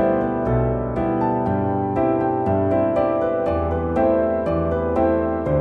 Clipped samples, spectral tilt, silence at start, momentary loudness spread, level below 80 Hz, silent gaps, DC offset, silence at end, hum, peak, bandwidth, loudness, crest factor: under 0.1%; -10.5 dB/octave; 0 s; 3 LU; -36 dBFS; none; under 0.1%; 0 s; none; -8 dBFS; 4.8 kHz; -20 LUFS; 12 dB